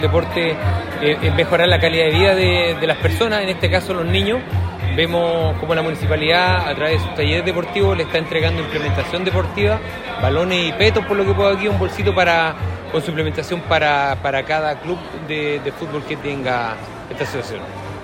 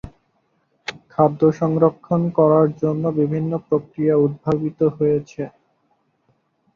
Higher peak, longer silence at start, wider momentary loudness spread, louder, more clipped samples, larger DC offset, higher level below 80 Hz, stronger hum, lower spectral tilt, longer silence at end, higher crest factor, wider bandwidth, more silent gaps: about the same, 0 dBFS vs -2 dBFS; about the same, 0 s vs 0.05 s; second, 10 LU vs 16 LU; about the same, -18 LUFS vs -19 LUFS; neither; neither; first, -42 dBFS vs -54 dBFS; neither; second, -6 dB/octave vs -9.5 dB/octave; second, 0 s vs 1.3 s; about the same, 16 dB vs 18 dB; first, 15.5 kHz vs 7 kHz; neither